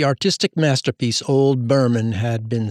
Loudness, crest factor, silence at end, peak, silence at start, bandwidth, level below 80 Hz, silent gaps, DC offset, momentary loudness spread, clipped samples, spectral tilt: -19 LUFS; 14 dB; 0 s; -4 dBFS; 0 s; 12.5 kHz; -60 dBFS; none; under 0.1%; 5 LU; under 0.1%; -5.5 dB/octave